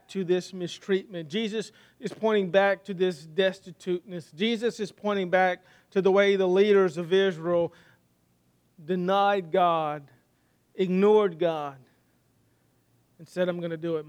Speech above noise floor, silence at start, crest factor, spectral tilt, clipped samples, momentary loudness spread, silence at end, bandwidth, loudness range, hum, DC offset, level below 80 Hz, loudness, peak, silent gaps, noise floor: 42 dB; 0.1 s; 18 dB; -6 dB/octave; under 0.1%; 14 LU; 0 s; 10 kHz; 4 LU; none; under 0.1%; -76 dBFS; -26 LUFS; -8 dBFS; none; -68 dBFS